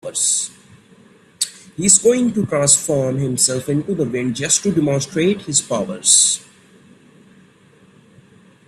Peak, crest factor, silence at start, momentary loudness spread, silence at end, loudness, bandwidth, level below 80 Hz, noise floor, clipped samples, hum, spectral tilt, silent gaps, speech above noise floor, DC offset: 0 dBFS; 20 dB; 0.05 s; 12 LU; 2.25 s; -16 LUFS; 15 kHz; -56 dBFS; -50 dBFS; under 0.1%; none; -3 dB/octave; none; 33 dB; under 0.1%